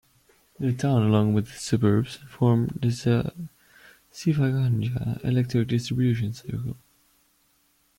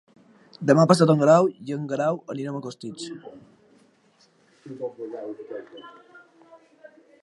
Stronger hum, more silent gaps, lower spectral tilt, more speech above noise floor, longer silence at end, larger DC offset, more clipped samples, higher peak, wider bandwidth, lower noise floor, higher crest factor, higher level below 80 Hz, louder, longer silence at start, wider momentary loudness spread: neither; neither; about the same, -7.5 dB/octave vs -6.5 dB/octave; first, 42 dB vs 38 dB; about the same, 1.25 s vs 1.3 s; neither; neither; second, -8 dBFS vs 0 dBFS; first, 15.5 kHz vs 11.5 kHz; first, -66 dBFS vs -61 dBFS; second, 16 dB vs 24 dB; first, -54 dBFS vs -74 dBFS; second, -25 LUFS vs -22 LUFS; about the same, 0.6 s vs 0.6 s; second, 12 LU vs 22 LU